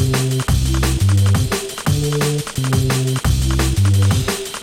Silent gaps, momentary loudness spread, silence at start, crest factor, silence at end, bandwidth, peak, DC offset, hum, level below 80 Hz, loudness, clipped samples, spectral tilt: none; 5 LU; 0 s; 12 dB; 0 s; 16.5 kHz; -4 dBFS; under 0.1%; none; -24 dBFS; -17 LUFS; under 0.1%; -5 dB/octave